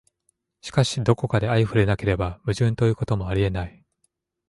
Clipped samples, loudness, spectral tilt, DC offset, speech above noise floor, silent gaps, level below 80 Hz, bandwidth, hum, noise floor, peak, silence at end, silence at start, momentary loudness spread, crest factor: under 0.1%; -23 LUFS; -6.5 dB/octave; under 0.1%; 50 dB; none; -40 dBFS; 11.5 kHz; none; -72 dBFS; -6 dBFS; 0.8 s; 0.65 s; 6 LU; 18 dB